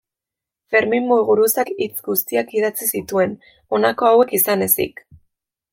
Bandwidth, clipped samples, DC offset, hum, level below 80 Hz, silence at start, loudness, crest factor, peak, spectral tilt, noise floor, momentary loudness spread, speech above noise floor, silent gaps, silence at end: 17 kHz; under 0.1%; under 0.1%; none; -60 dBFS; 0.7 s; -18 LUFS; 18 dB; -2 dBFS; -3.5 dB/octave; -87 dBFS; 8 LU; 69 dB; none; 0.85 s